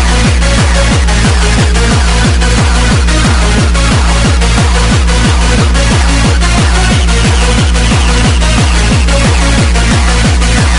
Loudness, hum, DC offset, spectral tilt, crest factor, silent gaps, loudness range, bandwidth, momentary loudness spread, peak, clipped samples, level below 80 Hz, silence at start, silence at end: -9 LUFS; none; under 0.1%; -4.5 dB/octave; 8 dB; none; 0 LU; 11 kHz; 0 LU; 0 dBFS; 0.1%; -10 dBFS; 0 s; 0 s